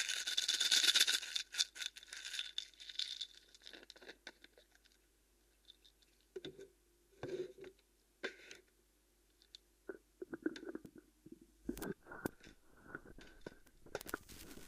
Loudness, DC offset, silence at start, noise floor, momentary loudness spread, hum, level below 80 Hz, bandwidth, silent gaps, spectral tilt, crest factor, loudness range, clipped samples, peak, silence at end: -38 LUFS; under 0.1%; 0 s; -74 dBFS; 26 LU; none; -70 dBFS; 15.5 kHz; none; -0.5 dB/octave; 30 dB; 20 LU; under 0.1%; -14 dBFS; 0 s